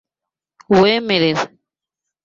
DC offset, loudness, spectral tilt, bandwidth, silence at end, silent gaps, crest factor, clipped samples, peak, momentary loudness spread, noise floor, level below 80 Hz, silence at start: under 0.1%; -15 LUFS; -5.5 dB/octave; 7.6 kHz; 0.8 s; none; 18 dB; under 0.1%; -2 dBFS; 10 LU; -86 dBFS; -54 dBFS; 0.7 s